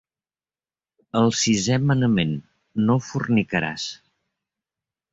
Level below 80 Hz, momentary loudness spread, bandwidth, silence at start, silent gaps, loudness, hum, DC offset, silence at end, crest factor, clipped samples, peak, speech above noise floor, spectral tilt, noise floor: -54 dBFS; 11 LU; 8 kHz; 1.15 s; none; -22 LUFS; none; under 0.1%; 1.15 s; 16 dB; under 0.1%; -8 dBFS; over 69 dB; -5 dB/octave; under -90 dBFS